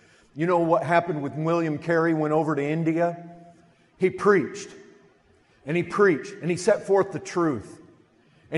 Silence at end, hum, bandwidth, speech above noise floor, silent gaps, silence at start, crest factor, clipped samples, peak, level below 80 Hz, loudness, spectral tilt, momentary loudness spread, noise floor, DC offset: 0 s; none; 11.5 kHz; 37 dB; none; 0.35 s; 18 dB; under 0.1%; -6 dBFS; -66 dBFS; -24 LUFS; -6.5 dB/octave; 11 LU; -60 dBFS; under 0.1%